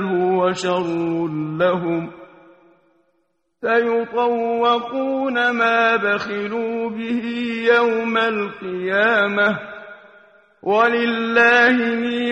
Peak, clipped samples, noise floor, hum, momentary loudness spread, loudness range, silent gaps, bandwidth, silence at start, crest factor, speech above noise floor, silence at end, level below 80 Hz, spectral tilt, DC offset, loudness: -2 dBFS; under 0.1%; -69 dBFS; none; 9 LU; 5 LU; none; 9.2 kHz; 0 s; 16 dB; 50 dB; 0 s; -64 dBFS; -5.5 dB/octave; under 0.1%; -19 LUFS